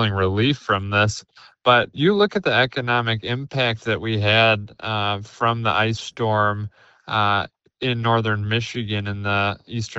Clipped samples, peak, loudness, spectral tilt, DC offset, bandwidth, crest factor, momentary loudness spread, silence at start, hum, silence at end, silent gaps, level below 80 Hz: under 0.1%; -2 dBFS; -21 LUFS; -5.5 dB/octave; under 0.1%; 8.2 kHz; 20 dB; 8 LU; 0 s; none; 0 s; none; -56 dBFS